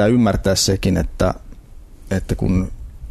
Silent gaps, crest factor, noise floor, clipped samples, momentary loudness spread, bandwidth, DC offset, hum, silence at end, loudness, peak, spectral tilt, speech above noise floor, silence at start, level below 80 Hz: none; 14 dB; -39 dBFS; under 0.1%; 12 LU; 14 kHz; under 0.1%; none; 0 s; -19 LUFS; -6 dBFS; -5 dB/octave; 22 dB; 0 s; -30 dBFS